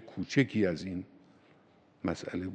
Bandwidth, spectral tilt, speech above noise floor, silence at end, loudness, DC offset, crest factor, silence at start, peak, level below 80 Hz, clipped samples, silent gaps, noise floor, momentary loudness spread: 9 kHz; -6.5 dB/octave; 31 dB; 0 s; -33 LUFS; under 0.1%; 22 dB; 0 s; -12 dBFS; -64 dBFS; under 0.1%; none; -63 dBFS; 13 LU